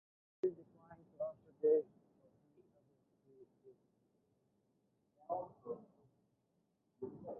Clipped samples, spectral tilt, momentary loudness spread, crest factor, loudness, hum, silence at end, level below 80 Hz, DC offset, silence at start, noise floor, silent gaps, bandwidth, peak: under 0.1%; -6 dB/octave; 26 LU; 22 dB; -41 LUFS; none; 0 s; -86 dBFS; under 0.1%; 0.45 s; -81 dBFS; none; 2.1 kHz; -24 dBFS